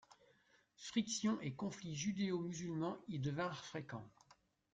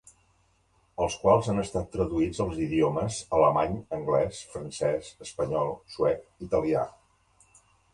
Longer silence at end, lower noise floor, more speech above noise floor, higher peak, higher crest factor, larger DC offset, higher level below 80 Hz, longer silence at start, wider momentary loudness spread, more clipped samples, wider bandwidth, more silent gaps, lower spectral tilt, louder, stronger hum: second, 0.4 s vs 1.05 s; first, -74 dBFS vs -67 dBFS; second, 32 dB vs 40 dB; second, -24 dBFS vs -8 dBFS; about the same, 18 dB vs 20 dB; neither; second, -78 dBFS vs -50 dBFS; second, 0.1 s vs 1 s; about the same, 11 LU vs 11 LU; neither; second, 9.4 kHz vs 11.5 kHz; neither; about the same, -5 dB/octave vs -6 dB/octave; second, -43 LUFS vs -28 LUFS; neither